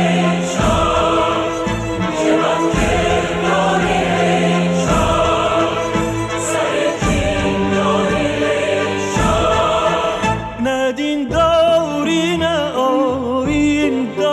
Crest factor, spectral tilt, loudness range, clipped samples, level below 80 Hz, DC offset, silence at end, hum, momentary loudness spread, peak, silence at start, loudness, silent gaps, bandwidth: 10 dB; -5 dB/octave; 1 LU; under 0.1%; -32 dBFS; under 0.1%; 0 s; none; 4 LU; -4 dBFS; 0 s; -16 LUFS; none; 13 kHz